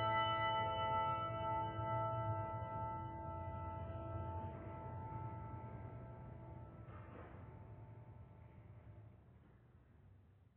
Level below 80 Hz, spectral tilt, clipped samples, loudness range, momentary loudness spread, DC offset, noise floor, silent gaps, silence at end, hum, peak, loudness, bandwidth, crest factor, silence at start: -62 dBFS; -4 dB/octave; under 0.1%; 17 LU; 21 LU; under 0.1%; -66 dBFS; none; 0.1 s; none; -28 dBFS; -44 LUFS; 4 kHz; 18 dB; 0 s